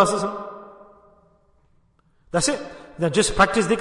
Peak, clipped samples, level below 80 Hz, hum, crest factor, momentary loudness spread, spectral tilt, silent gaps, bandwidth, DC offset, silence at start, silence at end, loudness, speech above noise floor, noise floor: -4 dBFS; under 0.1%; -44 dBFS; none; 20 dB; 20 LU; -3.5 dB/octave; none; 11 kHz; under 0.1%; 0 s; 0 s; -21 LUFS; 40 dB; -61 dBFS